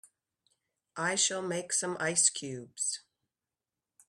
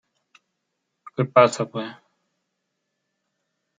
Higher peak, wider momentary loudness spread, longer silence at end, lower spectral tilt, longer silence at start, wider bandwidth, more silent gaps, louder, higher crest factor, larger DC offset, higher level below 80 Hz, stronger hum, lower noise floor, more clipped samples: second, -12 dBFS vs -2 dBFS; second, 15 LU vs 19 LU; second, 1.1 s vs 1.85 s; second, -1.5 dB/octave vs -5.5 dB/octave; second, 0.95 s vs 1.2 s; first, 15 kHz vs 9.4 kHz; neither; second, -30 LUFS vs -20 LUFS; about the same, 22 dB vs 24 dB; neither; second, -80 dBFS vs -72 dBFS; neither; first, under -90 dBFS vs -78 dBFS; neither